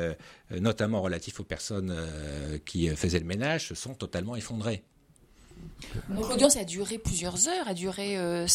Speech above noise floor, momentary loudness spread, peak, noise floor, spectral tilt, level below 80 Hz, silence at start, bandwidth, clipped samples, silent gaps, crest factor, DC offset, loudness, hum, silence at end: 29 dB; 13 LU; -6 dBFS; -59 dBFS; -4 dB/octave; -46 dBFS; 0 s; 16 kHz; under 0.1%; none; 24 dB; under 0.1%; -30 LUFS; none; 0 s